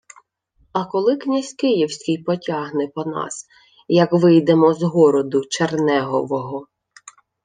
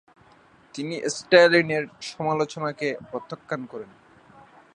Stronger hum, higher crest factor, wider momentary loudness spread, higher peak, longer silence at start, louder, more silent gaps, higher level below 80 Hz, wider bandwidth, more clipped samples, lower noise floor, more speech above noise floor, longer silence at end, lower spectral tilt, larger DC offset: neither; second, 16 dB vs 24 dB; second, 12 LU vs 19 LU; about the same, -2 dBFS vs -2 dBFS; about the same, 0.75 s vs 0.75 s; first, -19 LUFS vs -23 LUFS; neither; about the same, -66 dBFS vs -70 dBFS; about the same, 9.6 kHz vs 9.8 kHz; neither; first, -62 dBFS vs -55 dBFS; first, 43 dB vs 32 dB; about the same, 0.8 s vs 0.9 s; first, -6 dB/octave vs -4.5 dB/octave; neither